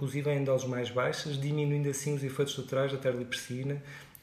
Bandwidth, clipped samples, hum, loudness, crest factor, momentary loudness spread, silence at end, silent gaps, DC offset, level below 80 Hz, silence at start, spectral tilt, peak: 15 kHz; under 0.1%; none; -32 LUFS; 14 dB; 6 LU; 0.1 s; none; under 0.1%; -68 dBFS; 0 s; -5.5 dB/octave; -18 dBFS